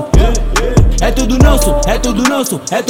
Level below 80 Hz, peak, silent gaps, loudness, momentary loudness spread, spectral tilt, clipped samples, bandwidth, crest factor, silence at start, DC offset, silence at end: -14 dBFS; 0 dBFS; none; -12 LUFS; 5 LU; -5 dB/octave; 1%; 16.5 kHz; 10 dB; 0 s; under 0.1%; 0 s